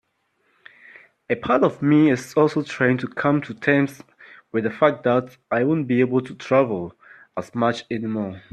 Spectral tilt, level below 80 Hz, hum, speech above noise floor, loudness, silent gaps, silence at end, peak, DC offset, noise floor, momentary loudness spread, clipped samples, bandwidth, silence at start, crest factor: -7 dB/octave; -64 dBFS; none; 48 dB; -21 LUFS; none; 0.15 s; -2 dBFS; under 0.1%; -68 dBFS; 10 LU; under 0.1%; 12.5 kHz; 1.3 s; 20 dB